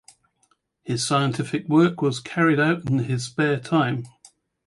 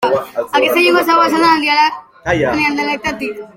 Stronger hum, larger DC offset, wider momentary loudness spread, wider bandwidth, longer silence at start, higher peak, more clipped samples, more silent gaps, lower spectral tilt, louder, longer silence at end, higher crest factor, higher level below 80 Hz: neither; neither; about the same, 10 LU vs 8 LU; second, 11.5 kHz vs 16.5 kHz; first, 0.85 s vs 0 s; second, -6 dBFS vs 0 dBFS; neither; neither; first, -5.5 dB/octave vs -4 dB/octave; second, -22 LUFS vs -13 LUFS; first, 0.6 s vs 0.1 s; about the same, 16 dB vs 14 dB; second, -62 dBFS vs -46 dBFS